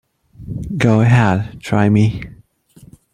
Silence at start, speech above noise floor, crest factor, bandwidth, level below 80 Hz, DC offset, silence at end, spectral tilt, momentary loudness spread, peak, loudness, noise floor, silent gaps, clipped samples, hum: 0.4 s; 33 dB; 14 dB; 10 kHz; -40 dBFS; under 0.1%; 0.8 s; -7.5 dB/octave; 18 LU; -2 dBFS; -15 LUFS; -47 dBFS; none; under 0.1%; none